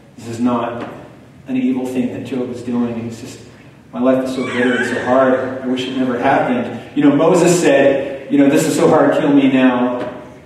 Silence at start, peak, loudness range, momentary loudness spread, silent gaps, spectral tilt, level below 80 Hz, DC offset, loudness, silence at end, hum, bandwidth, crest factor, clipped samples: 0.2 s; -2 dBFS; 8 LU; 13 LU; none; -5.5 dB/octave; -56 dBFS; under 0.1%; -15 LUFS; 0.05 s; none; 13.5 kHz; 14 dB; under 0.1%